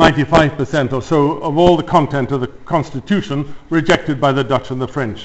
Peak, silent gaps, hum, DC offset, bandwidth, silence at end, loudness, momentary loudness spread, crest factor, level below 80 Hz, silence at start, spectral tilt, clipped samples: 0 dBFS; none; none; 1%; 8.2 kHz; 0 s; -16 LUFS; 8 LU; 16 dB; -36 dBFS; 0 s; -6.5 dB/octave; under 0.1%